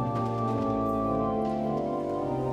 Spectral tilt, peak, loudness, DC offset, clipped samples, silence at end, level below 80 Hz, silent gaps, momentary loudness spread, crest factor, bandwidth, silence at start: -9 dB/octave; -14 dBFS; -29 LUFS; under 0.1%; under 0.1%; 0 s; -50 dBFS; none; 3 LU; 14 dB; 14 kHz; 0 s